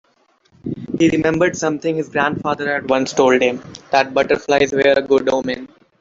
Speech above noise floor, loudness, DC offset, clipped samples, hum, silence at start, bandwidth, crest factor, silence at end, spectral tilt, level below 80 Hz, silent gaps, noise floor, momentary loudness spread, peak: 42 dB; -17 LUFS; under 0.1%; under 0.1%; none; 0.65 s; 7.8 kHz; 16 dB; 0.35 s; -5 dB/octave; -52 dBFS; none; -59 dBFS; 12 LU; -2 dBFS